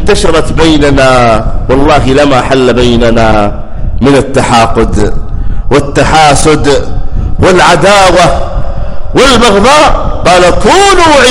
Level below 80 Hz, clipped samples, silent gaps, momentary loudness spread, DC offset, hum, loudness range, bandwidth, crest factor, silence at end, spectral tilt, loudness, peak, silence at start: -14 dBFS; 2%; none; 13 LU; under 0.1%; none; 3 LU; 12 kHz; 4 dB; 0 s; -4.5 dB/octave; -6 LUFS; 0 dBFS; 0 s